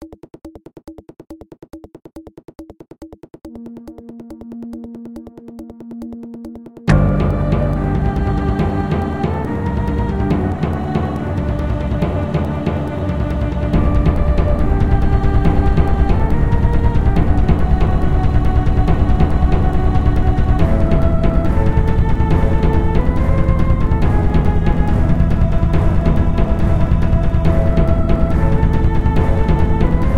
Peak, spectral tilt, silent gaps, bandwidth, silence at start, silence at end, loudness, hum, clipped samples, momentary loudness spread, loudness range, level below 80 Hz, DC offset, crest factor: 0 dBFS; -9 dB/octave; none; 7.2 kHz; 0 s; 0 s; -17 LUFS; none; under 0.1%; 19 LU; 17 LU; -18 dBFS; 5%; 14 dB